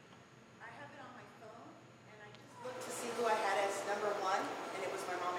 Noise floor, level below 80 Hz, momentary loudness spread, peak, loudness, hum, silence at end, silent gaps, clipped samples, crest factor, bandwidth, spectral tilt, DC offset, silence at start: -59 dBFS; -86 dBFS; 22 LU; -22 dBFS; -38 LUFS; none; 0 s; none; under 0.1%; 20 dB; 17 kHz; -2.5 dB/octave; under 0.1%; 0 s